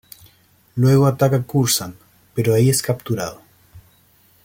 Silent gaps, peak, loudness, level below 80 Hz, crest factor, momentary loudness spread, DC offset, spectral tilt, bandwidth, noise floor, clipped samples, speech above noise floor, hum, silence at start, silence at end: none; -4 dBFS; -18 LUFS; -54 dBFS; 16 dB; 15 LU; under 0.1%; -5.5 dB/octave; 17 kHz; -55 dBFS; under 0.1%; 38 dB; none; 0.75 s; 0.65 s